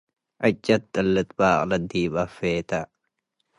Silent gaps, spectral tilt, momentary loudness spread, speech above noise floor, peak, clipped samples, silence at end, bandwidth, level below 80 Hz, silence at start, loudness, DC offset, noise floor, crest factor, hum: none; -6 dB/octave; 7 LU; 53 dB; -6 dBFS; under 0.1%; 0.75 s; 11.5 kHz; -50 dBFS; 0.4 s; -24 LUFS; under 0.1%; -76 dBFS; 18 dB; none